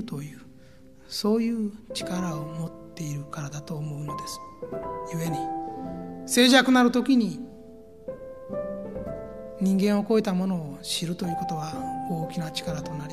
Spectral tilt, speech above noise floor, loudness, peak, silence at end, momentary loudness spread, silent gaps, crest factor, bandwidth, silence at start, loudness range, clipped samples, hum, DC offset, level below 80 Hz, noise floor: -5 dB/octave; 26 dB; -27 LUFS; -4 dBFS; 0 s; 17 LU; none; 24 dB; 15 kHz; 0 s; 10 LU; under 0.1%; none; 0.2%; -56 dBFS; -52 dBFS